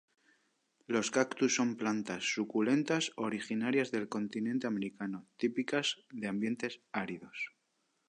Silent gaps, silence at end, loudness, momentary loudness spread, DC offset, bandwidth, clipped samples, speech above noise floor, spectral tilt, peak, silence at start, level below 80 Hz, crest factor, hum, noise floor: none; 0.6 s; -35 LUFS; 10 LU; under 0.1%; 10.5 kHz; under 0.1%; 45 dB; -4 dB/octave; -16 dBFS; 0.9 s; -80 dBFS; 20 dB; none; -79 dBFS